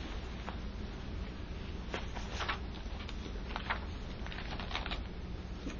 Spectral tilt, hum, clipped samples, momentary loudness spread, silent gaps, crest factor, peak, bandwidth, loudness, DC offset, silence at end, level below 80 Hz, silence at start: -5 dB/octave; 60 Hz at -45 dBFS; under 0.1%; 6 LU; none; 22 dB; -18 dBFS; 7.4 kHz; -42 LUFS; under 0.1%; 0 s; -44 dBFS; 0 s